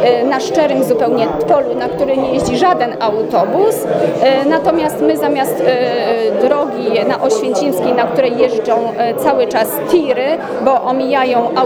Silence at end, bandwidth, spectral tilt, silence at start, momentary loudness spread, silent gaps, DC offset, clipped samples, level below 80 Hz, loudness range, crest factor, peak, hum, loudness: 0 s; over 20 kHz; -5 dB/octave; 0 s; 3 LU; none; under 0.1%; under 0.1%; -48 dBFS; 1 LU; 14 dB; 0 dBFS; none; -14 LUFS